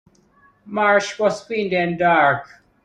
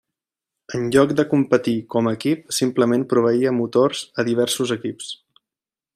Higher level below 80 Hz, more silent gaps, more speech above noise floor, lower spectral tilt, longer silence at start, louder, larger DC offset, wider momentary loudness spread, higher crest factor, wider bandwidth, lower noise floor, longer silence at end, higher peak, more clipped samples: about the same, -60 dBFS vs -62 dBFS; neither; second, 37 dB vs over 71 dB; about the same, -5 dB/octave vs -5 dB/octave; about the same, 0.65 s vs 0.7 s; about the same, -19 LUFS vs -20 LUFS; neither; about the same, 9 LU vs 10 LU; about the same, 18 dB vs 18 dB; second, 10 kHz vs 15.5 kHz; second, -56 dBFS vs under -90 dBFS; second, 0.4 s vs 0.8 s; about the same, -2 dBFS vs -2 dBFS; neither